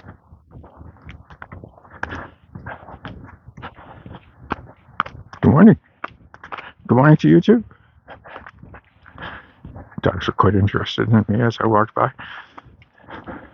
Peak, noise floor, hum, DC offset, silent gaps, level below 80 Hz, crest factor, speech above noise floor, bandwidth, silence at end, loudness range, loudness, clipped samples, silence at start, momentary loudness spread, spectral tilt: 0 dBFS; -48 dBFS; none; under 0.1%; none; -48 dBFS; 20 dB; 34 dB; 6.6 kHz; 0.15 s; 20 LU; -17 LUFS; under 0.1%; 0.1 s; 27 LU; -8.5 dB/octave